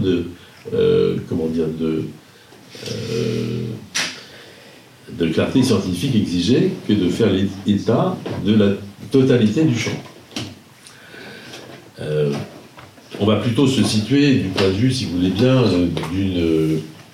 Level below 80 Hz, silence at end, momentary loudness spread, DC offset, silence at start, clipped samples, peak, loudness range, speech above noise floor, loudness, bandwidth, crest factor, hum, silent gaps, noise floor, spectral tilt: -54 dBFS; 0.1 s; 19 LU; under 0.1%; 0 s; under 0.1%; -2 dBFS; 8 LU; 27 dB; -19 LUFS; 15.5 kHz; 18 dB; none; none; -45 dBFS; -6 dB/octave